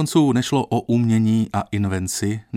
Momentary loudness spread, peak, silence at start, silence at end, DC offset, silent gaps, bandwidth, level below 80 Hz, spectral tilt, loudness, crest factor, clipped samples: 6 LU; -4 dBFS; 0 s; 0 s; under 0.1%; none; 16 kHz; -54 dBFS; -6 dB/octave; -20 LUFS; 14 dB; under 0.1%